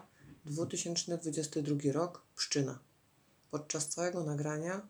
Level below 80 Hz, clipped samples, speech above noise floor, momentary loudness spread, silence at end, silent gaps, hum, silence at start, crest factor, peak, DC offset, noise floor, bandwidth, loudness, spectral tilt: -80 dBFS; under 0.1%; 33 dB; 10 LU; 0 s; none; none; 0 s; 18 dB; -20 dBFS; under 0.1%; -69 dBFS; over 20 kHz; -36 LUFS; -4 dB/octave